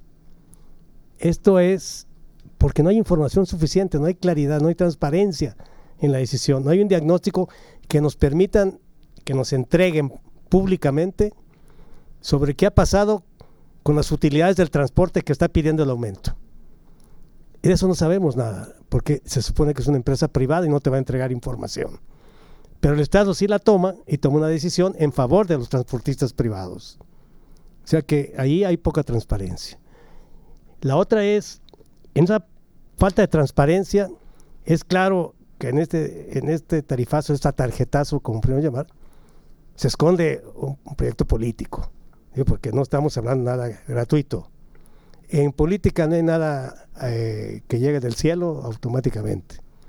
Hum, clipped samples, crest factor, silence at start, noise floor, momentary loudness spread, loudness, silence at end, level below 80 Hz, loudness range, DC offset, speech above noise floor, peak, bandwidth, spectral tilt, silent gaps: none; under 0.1%; 20 dB; 0.5 s; -48 dBFS; 11 LU; -21 LUFS; 0 s; -34 dBFS; 4 LU; under 0.1%; 28 dB; -2 dBFS; 17 kHz; -7 dB/octave; none